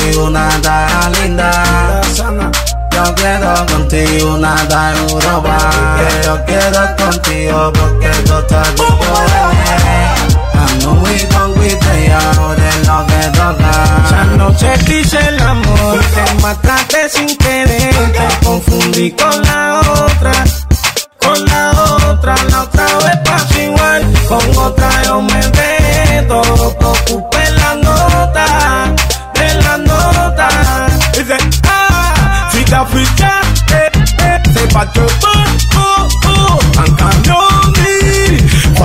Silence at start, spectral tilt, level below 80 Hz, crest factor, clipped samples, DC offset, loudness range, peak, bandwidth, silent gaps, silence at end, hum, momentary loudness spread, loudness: 0 s; -4.5 dB/octave; -14 dBFS; 8 dB; under 0.1%; under 0.1%; 2 LU; 0 dBFS; 16.5 kHz; none; 0 s; none; 3 LU; -9 LUFS